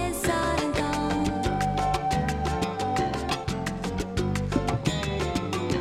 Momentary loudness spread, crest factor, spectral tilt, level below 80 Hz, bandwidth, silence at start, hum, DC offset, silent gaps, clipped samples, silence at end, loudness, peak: 3 LU; 18 dB; -5.5 dB/octave; -38 dBFS; 16.5 kHz; 0 s; none; under 0.1%; none; under 0.1%; 0 s; -27 LUFS; -10 dBFS